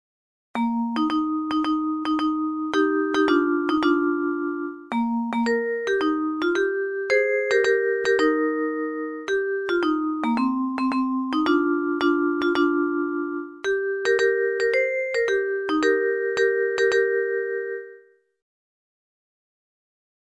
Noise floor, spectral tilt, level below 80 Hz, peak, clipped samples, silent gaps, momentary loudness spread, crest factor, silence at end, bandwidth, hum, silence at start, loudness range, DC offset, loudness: -52 dBFS; -4 dB/octave; -62 dBFS; -8 dBFS; under 0.1%; none; 6 LU; 16 dB; 2.25 s; 11 kHz; none; 0.55 s; 2 LU; under 0.1%; -23 LUFS